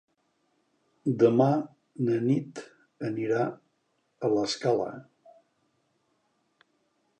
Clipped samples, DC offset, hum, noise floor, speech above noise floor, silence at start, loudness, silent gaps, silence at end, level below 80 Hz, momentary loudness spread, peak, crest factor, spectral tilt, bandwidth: under 0.1%; under 0.1%; none; -74 dBFS; 48 dB; 1.05 s; -28 LUFS; none; 2.2 s; -74 dBFS; 16 LU; -8 dBFS; 22 dB; -6.5 dB/octave; 9.8 kHz